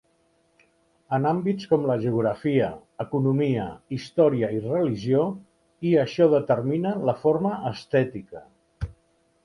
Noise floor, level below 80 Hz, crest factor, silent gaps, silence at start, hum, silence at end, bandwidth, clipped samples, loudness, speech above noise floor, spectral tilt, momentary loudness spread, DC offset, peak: -66 dBFS; -52 dBFS; 18 dB; none; 1.1 s; none; 0.5 s; 11 kHz; under 0.1%; -24 LUFS; 43 dB; -8.5 dB/octave; 15 LU; under 0.1%; -6 dBFS